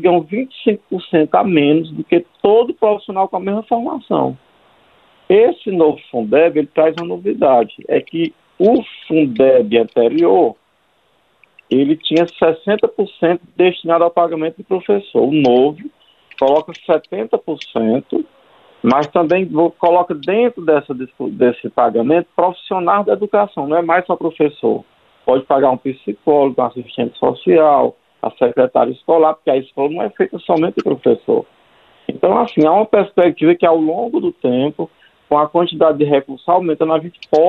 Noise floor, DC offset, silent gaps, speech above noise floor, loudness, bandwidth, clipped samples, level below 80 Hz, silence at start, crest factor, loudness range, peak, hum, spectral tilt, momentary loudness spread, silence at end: -59 dBFS; under 0.1%; none; 45 dB; -15 LUFS; 6.4 kHz; under 0.1%; -60 dBFS; 0 s; 14 dB; 3 LU; 0 dBFS; none; -8 dB/octave; 8 LU; 0 s